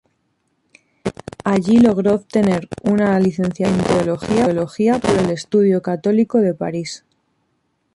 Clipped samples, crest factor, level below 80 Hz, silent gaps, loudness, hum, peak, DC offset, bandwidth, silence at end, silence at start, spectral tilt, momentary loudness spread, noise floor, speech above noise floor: under 0.1%; 14 dB; -48 dBFS; none; -17 LUFS; none; -4 dBFS; under 0.1%; 11.5 kHz; 1 s; 1.05 s; -7 dB/octave; 12 LU; -67 dBFS; 51 dB